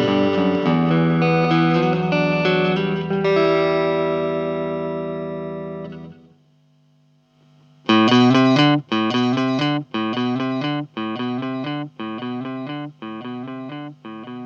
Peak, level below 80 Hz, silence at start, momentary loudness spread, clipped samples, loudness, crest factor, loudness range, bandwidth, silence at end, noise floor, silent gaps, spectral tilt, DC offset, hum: -4 dBFS; -58 dBFS; 0 s; 16 LU; under 0.1%; -19 LUFS; 16 dB; 10 LU; 7.2 kHz; 0 s; -58 dBFS; none; -7 dB/octave; under 0.1%; 50 Hz at -50 dBFS